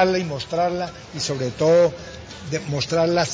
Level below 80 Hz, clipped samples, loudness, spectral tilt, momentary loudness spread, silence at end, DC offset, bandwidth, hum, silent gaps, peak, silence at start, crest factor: -48 dBFS; under 0.1%; -22 LUFS; -5 dB/octave; 14 LU; 0 s; under 0.1%; 7.8 kHz; none; none; -4 dBFS; 0 s; 16 dB